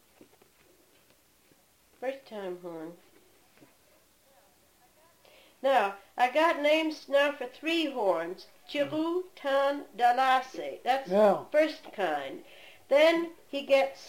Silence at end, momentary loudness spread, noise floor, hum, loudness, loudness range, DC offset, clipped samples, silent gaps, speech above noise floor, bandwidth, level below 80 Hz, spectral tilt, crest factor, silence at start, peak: 0 s; 15 LU; -64 dBFS; none; -28 LUFS; 16 LU; under 0.1%; under 0.1%; none; 36 dB; 16.5 kHz; -78 dBFS; -4 dB/octave; 18 dB; 2 s; -12 dBFS